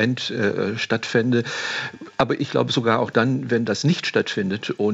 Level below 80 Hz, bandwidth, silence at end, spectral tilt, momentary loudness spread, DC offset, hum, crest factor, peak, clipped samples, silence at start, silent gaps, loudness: -62 dBFS; 8.2 kHz; 0 s; -5.5 dB/octave; 5 LU; under 0.1%; none; 18 dB; -2 dBFS; under 0.1%; 0 s; none; -22 LUFS